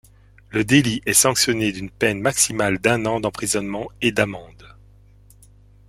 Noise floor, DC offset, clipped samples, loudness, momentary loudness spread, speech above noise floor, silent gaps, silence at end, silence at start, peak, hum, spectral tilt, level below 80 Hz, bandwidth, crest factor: -50 dBFS; under 0.1%; under 0.1%; -19 LUFS; 9 LU; 29 dB; none; 1.2 s; 0.5 s; -2 dBFS; 50 Hz at -40 dBFS; -3 dB/octave; -48 dBFS; 16.5 kHz; 20 dB